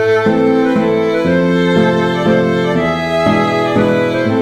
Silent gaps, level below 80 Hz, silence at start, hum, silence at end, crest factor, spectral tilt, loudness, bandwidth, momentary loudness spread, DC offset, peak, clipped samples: none; -44 dBFS; 0 s; none; 0 s; 12 dB; -7 dB/octave; -13 LUFS; 11 kHz; 2 LU; under 0.1%; -2 dBFS; under 0.1%